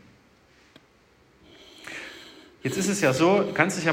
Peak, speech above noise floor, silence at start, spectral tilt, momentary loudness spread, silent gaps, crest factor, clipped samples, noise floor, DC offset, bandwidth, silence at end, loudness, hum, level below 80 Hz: -2 dBFS; 37 dB; 1.8 s; -4.5 dB/octave; 23 LU; none; 24 dB; under 0.1%; -59 dBFS; under 0.1%; 16 kHz; 0 s; -23 LUFS; none; -64 dBFS